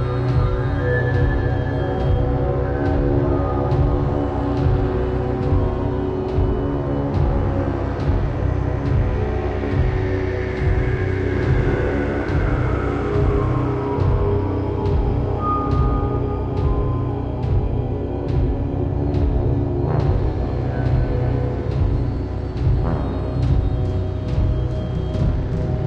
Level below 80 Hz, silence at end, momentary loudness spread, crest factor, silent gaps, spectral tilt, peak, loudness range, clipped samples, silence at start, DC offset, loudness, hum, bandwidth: -24 dBFS; 0 s; 4 LU; 14 dB; none; -9.5 dB/octave; -6 dBFS; 2 LU; under 0.1%; 0 s; under 0.1%; -21 LUFS; none; 6.4 kHz